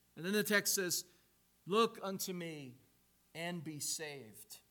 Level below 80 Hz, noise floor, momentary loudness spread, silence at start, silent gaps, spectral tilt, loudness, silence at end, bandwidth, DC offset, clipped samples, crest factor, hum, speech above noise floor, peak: -84 dBFS; -72 dBFS; 21 LU; 0.15 s; none; -2.5 dB/octave; -37 LUFS; 0.1 s; 19 kHz; under 0.1%; under 0.1%; 24 dB; 60 Hz at -65 dBFS; 34 dB; -16 dBFS